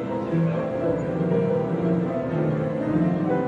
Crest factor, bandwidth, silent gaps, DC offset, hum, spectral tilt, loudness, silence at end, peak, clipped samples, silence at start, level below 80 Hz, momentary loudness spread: 14 dB; 7.4 kHz; none; under 0.1%; none; -10 dB/octave; -24 LUFS; 0 s; -10 dBFS; under 0.1%; 0 s; -52 dBFS; 3 LU